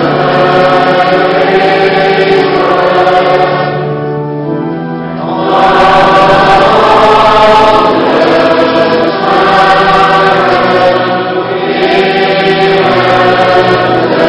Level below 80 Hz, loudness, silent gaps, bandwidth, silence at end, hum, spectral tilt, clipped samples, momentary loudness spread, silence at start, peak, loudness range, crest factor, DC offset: -36 dBFS; -7 LUFS; none; 11 kHz; 0 s; none; -6 dB/octave; 4%; 9 LU; 0 s; 0 dBFS; 4 LU; 6 dB; under 0.1%